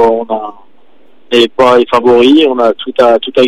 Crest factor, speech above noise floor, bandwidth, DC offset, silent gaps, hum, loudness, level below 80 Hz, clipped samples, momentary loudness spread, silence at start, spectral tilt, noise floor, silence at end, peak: 10 dB; 40 dB; 12 kHz; 2%; none; none; -9 LUFS; -46 dBFS; 0.1%; 10 LU; 0 s; -5 dB/octave; -49 dBFS; 0 s; 0 dBFS